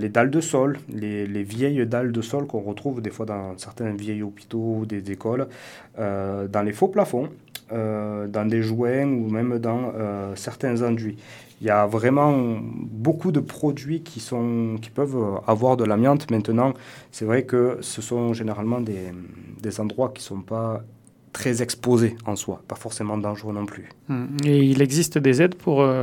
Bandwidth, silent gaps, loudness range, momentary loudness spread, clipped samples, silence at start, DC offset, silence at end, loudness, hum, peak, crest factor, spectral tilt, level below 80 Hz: 18 kHz; none; 6 LU; 13 LU; under 0.1%; 0 s; under 0.1%; 0 s; -24 LUFS; none; -2 dBFS; 22 dB; -6.5 dB/octave; -64 dBFS